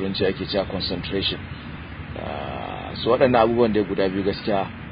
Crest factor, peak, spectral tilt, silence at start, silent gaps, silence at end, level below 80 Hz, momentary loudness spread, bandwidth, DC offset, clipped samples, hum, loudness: 20 dB; -4 dBFS; -10.5 dB/octave; 0 s; none; 0 s; -42 dBFS; 16 LU; 5.2 kHz; under 0.1%; under 0.1%; none; -23 LUFS